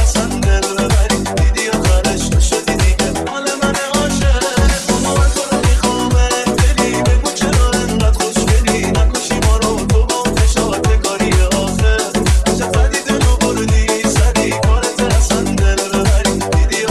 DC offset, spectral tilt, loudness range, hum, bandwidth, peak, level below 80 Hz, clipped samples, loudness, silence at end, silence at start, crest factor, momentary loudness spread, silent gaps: 0.2%; -4.5 dB/octave; 1 LU; none; 13.5 kHz; 0 dBFS; -16 dBFS; under 0.1%; -14 LUFS; 0 s; 0 s; 12 dB; 2 LU; none